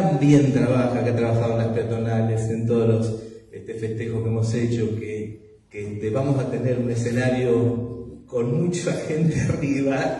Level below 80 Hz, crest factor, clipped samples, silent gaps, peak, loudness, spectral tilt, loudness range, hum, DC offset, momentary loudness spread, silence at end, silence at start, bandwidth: -50 dBFS; 18 dB; under 0.1%; none; -4 dBFS; -22 LUFS; -7.5 dB/octave; 4 LU; none; under 0.1%; 13 LU; 0 s; 0 s; 10.5 kHz